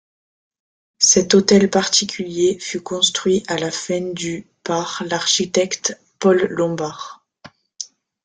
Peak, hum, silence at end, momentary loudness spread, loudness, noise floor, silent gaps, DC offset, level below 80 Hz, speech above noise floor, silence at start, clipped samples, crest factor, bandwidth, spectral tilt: 0 dBFS; none; 0.4 s; 15 LU; -18 LUFS; -47 dBFS; none; under 0.1%; -58 dBFS; 28 dB; 1 s; under 0.1%; 20 dB; 10 kHz; -3 dB/octave